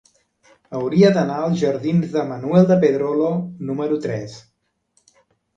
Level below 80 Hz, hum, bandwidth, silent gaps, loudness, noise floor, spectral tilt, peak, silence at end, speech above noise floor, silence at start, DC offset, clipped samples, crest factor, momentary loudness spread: -62 dBFS; none; 7.6 kHz; none; -19 LUFS; -66 dBFS; -8 dB/octave; -2 dBFS; 1.15 s; 48 dB; 0.7 s; under 0.1%; under 0.1%; 18 dB; 12 LU